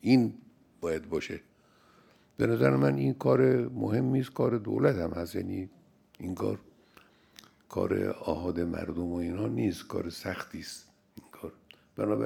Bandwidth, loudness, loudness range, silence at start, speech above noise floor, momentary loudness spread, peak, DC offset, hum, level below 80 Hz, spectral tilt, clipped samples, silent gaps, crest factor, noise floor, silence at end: 16.5 kHz; -30 LUFS; 8 LU; 0.05 s; 33 dB; 18 LU; -10 dBFS; under 0.1%; none; -62 dBFS; -7.5 dB/octave; under 0.1%; none; 22 dB; -62 dBFS; 0 s